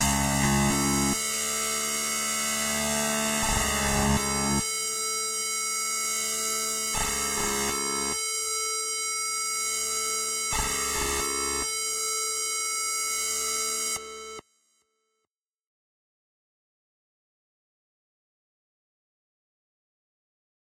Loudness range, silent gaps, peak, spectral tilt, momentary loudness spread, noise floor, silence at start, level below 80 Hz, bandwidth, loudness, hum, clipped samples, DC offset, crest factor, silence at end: 4 LU; none; -12 dBFS; -2 dB/octave; 3 LU; -84 dBFS; 0 s; -44 dBFS; 16 kHz; -26 LUFS; none; under 0.1%; under 0.1%; 18 dB; 6.2 s